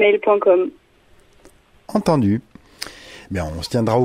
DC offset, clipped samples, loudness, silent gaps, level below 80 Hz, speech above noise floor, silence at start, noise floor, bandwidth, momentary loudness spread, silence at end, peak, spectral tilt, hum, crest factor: under 0.1%; under 0.1%; -19 LUFS; none; -44 dBFS; 35 dB; 0 s; -52 dBFS; 16 kHz; 18 LU; 0 s; -4 dBFS; -6.5 dB/octave; none; 16 dB